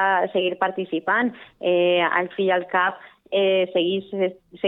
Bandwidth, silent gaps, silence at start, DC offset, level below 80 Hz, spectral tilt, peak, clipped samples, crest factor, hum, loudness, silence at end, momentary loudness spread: 4.1 kHz; none; 0 s; under 0.1%; -72 dBFS; -8 dB/octave; -6 dBFS; under 0.1%; 16 dB; none; -22 LUFS; 0 s; 8 LU